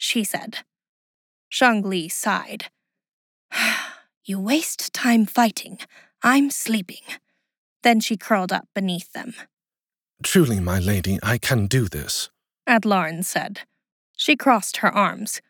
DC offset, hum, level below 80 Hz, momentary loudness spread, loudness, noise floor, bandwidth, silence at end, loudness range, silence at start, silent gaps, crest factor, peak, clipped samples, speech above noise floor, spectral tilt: under 0.1%; none; -50 dBFS; 17 LU; -21 LUFS; under -90 dBFS; over 20 kHz; 0.1 s; 3 LU; 0 s; 0.89-1.51 s, 3.13-3.49 s, 4.17-4.21 s, 7.58-7.80 s, 13.92-14.14 s; 20 dB; -4 dBFS; under 0.1%; over 69 dB; -4 dB/octave